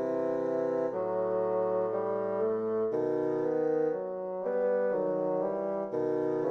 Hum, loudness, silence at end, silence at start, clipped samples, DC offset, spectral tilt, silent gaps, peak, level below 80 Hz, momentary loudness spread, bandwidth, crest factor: none; -31 LUFS; 0 s; 0 s; under 0.1%; under 0.1%; -9 dB/octave; none; -20 dBFS; -74 dBFS; 3 LU; 6.2 kHz; 10 dB